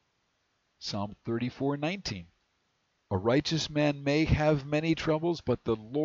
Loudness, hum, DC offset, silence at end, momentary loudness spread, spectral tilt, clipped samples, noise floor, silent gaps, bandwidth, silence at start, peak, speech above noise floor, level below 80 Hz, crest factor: -30 LUFS; none; under 0.1%; 0 s; 9 LU; -6 dB/octave; under 0.1%; -75 dBFS; none; 7.6 kHz; 0.8 s; -14 dBFS; 46 dB; -48 dBFS; 18 dB